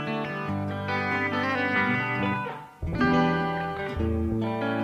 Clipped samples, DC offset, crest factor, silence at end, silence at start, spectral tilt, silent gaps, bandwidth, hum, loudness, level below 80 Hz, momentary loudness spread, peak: under 0.1%; under 0.1%; 16 dB; 0 s; 0 s; -7.5 dB/octave; none; 14 kHz; none; -27 LUFS; -42 dBFS; 7 LU; -10 dBFS